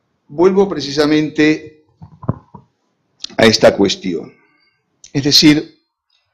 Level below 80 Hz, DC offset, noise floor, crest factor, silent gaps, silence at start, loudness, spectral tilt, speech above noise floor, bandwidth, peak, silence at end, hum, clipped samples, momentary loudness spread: -46 dBFS; under 0.1%; -65 dBFS; 16 dB; none; 0.3 s; -13 LUFS; -4.5 dB/octave; 52 dB; 15.5 kHz; 0 dBFS; 0.7 s; none; under 0.1%; 17 LU